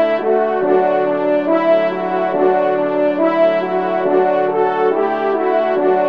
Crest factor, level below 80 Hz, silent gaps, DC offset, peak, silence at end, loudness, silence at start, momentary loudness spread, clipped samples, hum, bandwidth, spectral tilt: 12 dB; -68 dBFS; none; 0.4%; -2 dBFS; 0 s; -15 LUFS; 0 s; 3 LU; under 0.1%; none; 5.4 kHz; -8 dB/octave